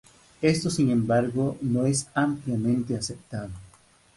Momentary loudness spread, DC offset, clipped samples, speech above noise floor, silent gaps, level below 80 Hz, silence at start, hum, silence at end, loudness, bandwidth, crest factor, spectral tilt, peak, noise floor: 13 LU; under 0.1%; under 0.1%; 32 dB; none; -54 dBFS; 0.4 s; none; 0.5 s; -26 LUFS; 11.5 kHz; 18 dB; -5.5 dB/octave; -8 dBFS; -57 dBFS